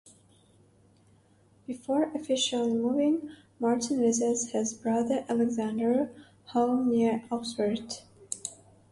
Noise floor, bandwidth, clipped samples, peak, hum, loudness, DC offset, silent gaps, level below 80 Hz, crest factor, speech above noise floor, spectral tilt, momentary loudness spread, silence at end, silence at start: -62 dBFS; 11.5 kHz; under 0.1%; -12 dBFS; none; -29 LUFS; under 0.1%; none; -70 dBFS; 16 dB; 34 dB; -4 dB/octave; 14 LU; 0.4 s; 1.7 s